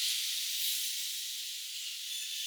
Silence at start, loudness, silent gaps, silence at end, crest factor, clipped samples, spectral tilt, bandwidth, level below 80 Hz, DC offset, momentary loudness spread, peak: 0 s; -33 LUFS; none; 0 s; 16 dB; under 0.1%; 12.5 dB/octave; over 20 kHz; under -90 dBFS; under 0.1%; 7 LU; -20 dBFS